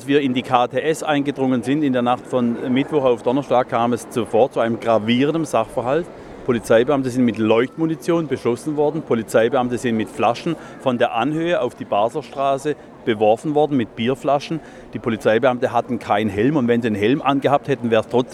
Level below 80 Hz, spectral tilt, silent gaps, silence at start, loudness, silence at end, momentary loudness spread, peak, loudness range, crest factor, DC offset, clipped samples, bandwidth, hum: -54 dBFS; -6 dB/octave; none; 0 s; -19 LUFS; 0 s; 6 LU; 0 dBFS; 2 LU; 18 dB; under 0.1%; under 0.1%; 13 kHz; none